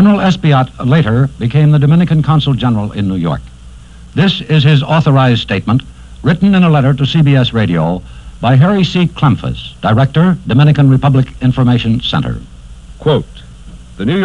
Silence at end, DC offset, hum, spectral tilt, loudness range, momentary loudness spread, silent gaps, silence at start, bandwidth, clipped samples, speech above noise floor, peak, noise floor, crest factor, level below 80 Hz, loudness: 0 s; 0.5%; none; -8 dB/octave; 2 LU; 9 LU; none; 0 s; 8.2 kHz; under 0.1%; 23 dB; 0 dBFS; -33 dBFS; 10 dB; -34 dBFS; -11 LUFS